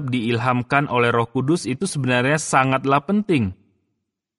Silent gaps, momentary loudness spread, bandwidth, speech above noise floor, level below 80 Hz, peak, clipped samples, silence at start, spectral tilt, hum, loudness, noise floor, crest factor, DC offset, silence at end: none; 4 LU; 11.5 kHz; 57 dB; -56 dBFS; -2 dBFS; under 0.1%; 0 s; -5.5 dB/octave; none; -20 LUFS; -77 dBFS; 18 dB; under 0.1%; 0.85 s